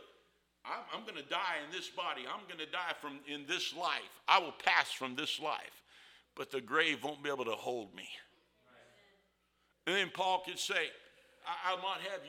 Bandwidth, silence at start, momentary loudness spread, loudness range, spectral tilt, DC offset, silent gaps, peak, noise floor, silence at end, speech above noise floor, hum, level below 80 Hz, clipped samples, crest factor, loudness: 17.5 kHz; 0 s; 14 LU; 6 LU; -2 dB/octave; under 0.1%; none; -10 dBFS; -77 dBFS; 0 s; 39 dB; none; -84 dBFS; under 0.1%; 28 dB; -36 LUFS